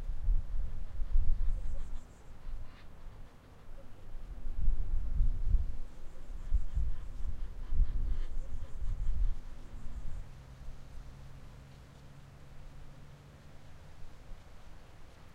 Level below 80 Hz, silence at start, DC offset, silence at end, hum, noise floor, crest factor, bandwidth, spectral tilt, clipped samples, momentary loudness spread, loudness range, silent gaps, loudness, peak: -34 dBFS; 0 s; under 0.1%; 0.05 s; none; -52 dBFS; 16 dB; 3.4 kHz; -7 dB/octave; under 0.1%; 19 LU; 15 LU; none; -41 LUFS; -14 dBFS